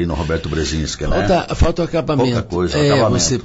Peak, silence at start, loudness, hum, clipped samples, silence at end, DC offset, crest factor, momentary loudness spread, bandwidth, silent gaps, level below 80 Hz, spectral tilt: -4 dBFS; 0 s; -17 LUFS; none; under 0.1%; 0 s; under 0.1%; 12 dB; 6 LU; 8 kHz; none; -26 dBFS; -5 dB/octave